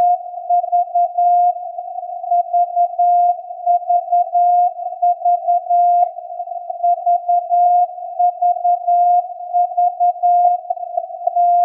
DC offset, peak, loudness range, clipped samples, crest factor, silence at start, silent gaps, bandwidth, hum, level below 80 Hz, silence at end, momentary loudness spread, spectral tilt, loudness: under 0.1%; -4 dBFS; 1 LU; under 0.1%; 12 dB; 0 s; none; 2.8 kHz; none; under -90 dBFS; 0 s; 9 LU; -4 dB/octave; -16 LUFS